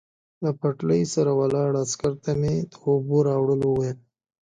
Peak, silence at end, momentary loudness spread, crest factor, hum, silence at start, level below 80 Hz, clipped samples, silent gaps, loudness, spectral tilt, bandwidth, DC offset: -8 dBFS; 0.5 s; 6 LU; 14 dB; none; 0.4 s; -54 dBFS; under 0.1%; none; -24 LUFS; -7 dB/octave; 9.4 kHz; under 0.1%